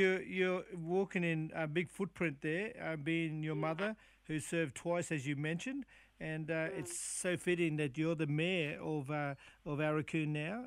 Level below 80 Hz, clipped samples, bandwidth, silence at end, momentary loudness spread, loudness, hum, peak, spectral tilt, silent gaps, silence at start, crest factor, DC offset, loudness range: -70 dBFS; under 0.1%; 15 kHz; 0 s; 8 LU; -38 LUFS; none; -20 dBFS; -5.5 dB/octave; none; 0 s; 18 dB; under 0.1%; 3 LU